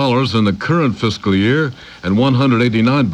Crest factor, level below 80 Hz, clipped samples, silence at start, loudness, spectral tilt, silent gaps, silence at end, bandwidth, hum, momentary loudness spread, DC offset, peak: 12 dB; -46 dBFS; under 0.1%; 0 s; -15 LUFS; -7 dB/octave; none; 0 s; 9.6 kHz; none; 5 LU; under 0.1%; -4 dBFS